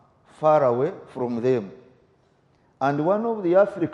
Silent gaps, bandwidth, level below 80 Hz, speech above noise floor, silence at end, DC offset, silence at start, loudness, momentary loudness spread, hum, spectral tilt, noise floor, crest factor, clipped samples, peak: none; 7.2 kHz; -70 dBFS; 40 dB; 0 s; under 0.1%; 0.4 s; -22 LUFS; 9 LU; none; -8.5 dB/octave; -62 dBFS; 16 dB; under 0.1%; -8 dBFS